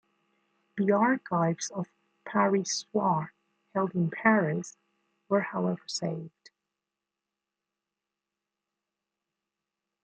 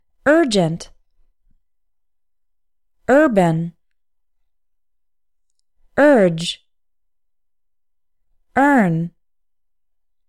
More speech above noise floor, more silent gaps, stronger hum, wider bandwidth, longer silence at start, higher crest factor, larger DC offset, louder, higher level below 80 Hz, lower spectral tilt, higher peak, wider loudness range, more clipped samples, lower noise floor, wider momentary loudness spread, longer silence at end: second, 61 dB vs 68 dB; neither; neither; second, 9 kHz vs 14 kHz; first, 0.75 s vs 0.25 s; first, 24 dB vs 18 dB; neither; second, -29 LUFS vs -16 LUFS; second, -78 dBFS vs -54 dBFS; about the same, -5 dB/octave vs -6 dB/octave; second, -8 dBFS vs -2 dBFS; first, 9 LU vs 3 LU; neither; first, -88 dBFS vs -82 dBFS; about the same, 17 LU vs 17 LU; first, 3.75 s vs 1.2 s